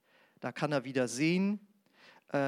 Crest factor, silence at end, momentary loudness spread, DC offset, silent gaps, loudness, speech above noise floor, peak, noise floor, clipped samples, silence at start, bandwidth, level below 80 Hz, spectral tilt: 16 dB; 0 s; 12 LU; under 0.1%; none; -33 LUFS; 30 dB; -18 dBFS; -62 dBFS; under 0.1%; 0.4 s; 14 kHz; -88 dBFS; -5.5 dB/octave